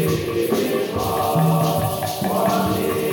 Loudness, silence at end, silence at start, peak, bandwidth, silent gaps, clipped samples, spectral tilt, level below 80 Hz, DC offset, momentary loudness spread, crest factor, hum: -20 LUFS; 0 s; 0 s; -8 dBFS; 17 kHz; none; under 0.1%; -6 dB/octave; -44 dBFS; under 0.1%; 4 LU; 12 dB; none